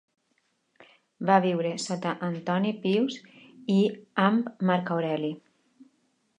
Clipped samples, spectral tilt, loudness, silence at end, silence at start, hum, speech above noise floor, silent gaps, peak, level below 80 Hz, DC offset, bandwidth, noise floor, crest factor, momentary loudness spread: under 0.1%; -6 dB/octave; -27 LUFS; 1 s; 1.2 s; none; 47 dB; none; -6 dBFS; -78 dBFS; under 0.1%; 9.8 kHz; -73 dBFS; 22 dB; 10 LU